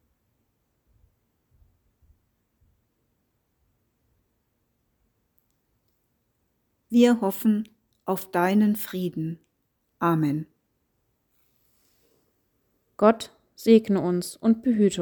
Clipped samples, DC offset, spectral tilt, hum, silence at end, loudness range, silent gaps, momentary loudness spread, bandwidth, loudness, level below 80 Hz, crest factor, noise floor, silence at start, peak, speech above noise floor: under 0.1%; under 0.1%; -6.5 dB/octave; none; 0 s; 7 LU; none; 14 LU; over 20 kHz; -23 LUFS; -68 dBFS; 22 dB; -74 dBFS; 6.9 s; -4 dBFS; 52 dB